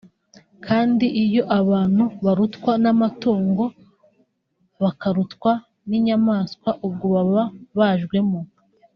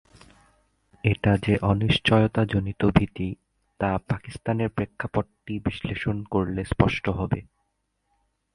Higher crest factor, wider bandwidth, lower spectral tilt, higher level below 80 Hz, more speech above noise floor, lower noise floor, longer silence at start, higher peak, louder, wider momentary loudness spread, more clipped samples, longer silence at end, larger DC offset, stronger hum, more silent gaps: second, 16 dB vs 22 dB; second, 6.2 kHz vs 11 kHz; about the same, -7 dB/octave vs -7.5 dB/octave; second, -60 dBFS vs -42 dBFS; about the same, 49 dB vs 51 dB; second, -68 dBFS vs -75 dBFS; second, 0.6 s vs 1.05 s; about the same, -4 dBFS vs -2 dBFS; first, -20 LUFS vs -25 LUFS; about the same, 7 LU vs 9 LU; neither; second, 0.5 s vs 1.1 s; neither; neither; neither